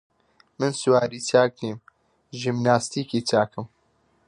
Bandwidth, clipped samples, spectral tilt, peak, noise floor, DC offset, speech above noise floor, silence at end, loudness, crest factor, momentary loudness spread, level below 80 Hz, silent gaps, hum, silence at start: 11.5 kHz; under 0.1%; -5 dB/octave; -4 dBFS; -65 dBFS; under 0.1%; 43 dB; 0.6 s; -23 LUFS; 20 dB; 17 LU; -64 dBFS; none; none; 0.6 s